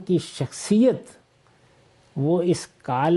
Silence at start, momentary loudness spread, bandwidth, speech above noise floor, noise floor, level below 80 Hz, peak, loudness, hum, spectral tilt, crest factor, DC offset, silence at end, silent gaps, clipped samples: 0 s; 12 LU; 11.5 kHz; 37 dB; -58 dBFS; -64 dBFS; -8 dBFS; -23 LUFS; none; -6.5 dB/octave; 16 dB; under 0.1%; 0 s; none; under 0.1%